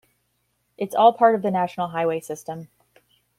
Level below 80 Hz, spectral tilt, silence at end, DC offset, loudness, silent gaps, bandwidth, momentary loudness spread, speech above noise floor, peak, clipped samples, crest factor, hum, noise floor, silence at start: -70 dBFS; -6 dB/octave; 0.75 s; under 0.1%; -21 LUFS; none; 14.5 kHz; 17 LU; 50 dB; -4 dBFS; under 0.1%; 20 dB; none; -71 dBFS; 0.8 s